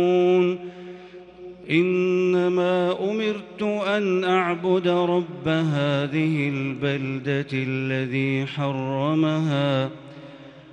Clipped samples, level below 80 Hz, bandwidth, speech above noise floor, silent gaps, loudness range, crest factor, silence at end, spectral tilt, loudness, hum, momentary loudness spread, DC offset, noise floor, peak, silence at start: under 0.1%; -64 dBFS; 8.4 kHz; 20 dB; none; 2 LU; 16 dB; 0 s; -7.5 dB/octave; -23 LUFS; none; 17 LU; under 0.1%; -43 dBFS; -8 dBFS; 0 s